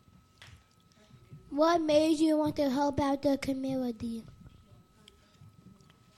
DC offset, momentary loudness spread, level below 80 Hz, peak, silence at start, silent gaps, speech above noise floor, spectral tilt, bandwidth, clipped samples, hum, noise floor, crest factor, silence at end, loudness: under 0.1%; 13 LU; -60 dBFS; -14 dBFS; 0.4 s; none; 34 dB; -5.5 dB/octave; 14 kHz; under 0.1%; none; -63 dBFS; 18 dB; 0.7 s; -29 LUFS